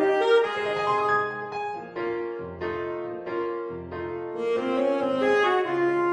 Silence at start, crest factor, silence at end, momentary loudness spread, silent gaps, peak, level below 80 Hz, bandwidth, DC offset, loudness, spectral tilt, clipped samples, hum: 0 s; 16 dB; 0 s; 11 LU; none; -8 dBFS; -62 dBFS; 10 kHz; under 0.1%; -26 LUFS; -5.5 dB/octave; under 0.1%; none